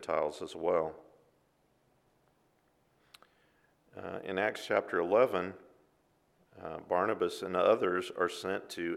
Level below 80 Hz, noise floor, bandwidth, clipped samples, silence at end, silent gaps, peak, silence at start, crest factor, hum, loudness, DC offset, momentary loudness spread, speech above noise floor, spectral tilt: -74 dBFS; -72 dBFS; 14 kHz; under 0.1%; 0 s; none; -12 dBFS; 0 s; 22 dB; none; -32 LUFS; under 0.1%; 16 LU; 40 dB; -5 dB/octave